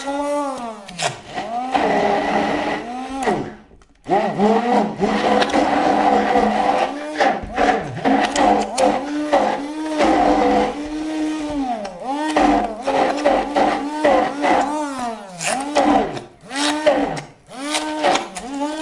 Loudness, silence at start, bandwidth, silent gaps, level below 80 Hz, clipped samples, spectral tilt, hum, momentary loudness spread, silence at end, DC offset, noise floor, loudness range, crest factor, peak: -19 LUFS; 0 s; 11.5 kHz; none; -46 dBFS; under 0.1%; -4 dB/octave; none; 10 LU; 0 s; under 0.1%; -47 dBFS; 3 LU; 16 dB; -4 dBFS